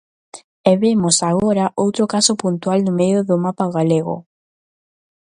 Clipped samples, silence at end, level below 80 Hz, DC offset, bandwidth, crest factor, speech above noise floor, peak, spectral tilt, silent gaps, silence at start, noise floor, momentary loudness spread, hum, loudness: under 0.1%; 1.05 s; -56 dBFS; under 0.1%; 11.5 kHz; 18 dB; over 74 dB; 0 dBFS; -5 dB/octave; 0.44-0.64 s; 0.35 s; under -90 dBFS; 5 LU; none; -17 LUFS